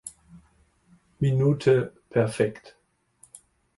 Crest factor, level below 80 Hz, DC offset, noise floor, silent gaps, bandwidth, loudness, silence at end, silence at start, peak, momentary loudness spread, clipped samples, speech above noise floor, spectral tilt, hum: 18 dB; -58 dBFS; under 0.1%; -63 dBFS; none; 11.5 kHz; -24 LUFS; 1.1 s; 0.05 s; -8 dBFS; 11 LU; under 0.1%; 40 dB; -7 dB/octave; none